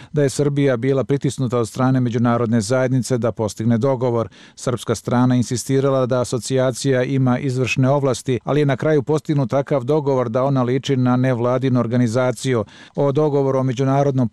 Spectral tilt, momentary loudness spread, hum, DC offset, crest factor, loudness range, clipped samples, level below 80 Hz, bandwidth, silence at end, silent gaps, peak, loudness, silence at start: -6.5 dB/octave; 4 LU; none; 0.1%; 10 dB; 1 LU; under 0.1%; -56 dBFS; 12.5 kHz; 0.05 s; none; -8 dBFS; -19 LUFS; 0 s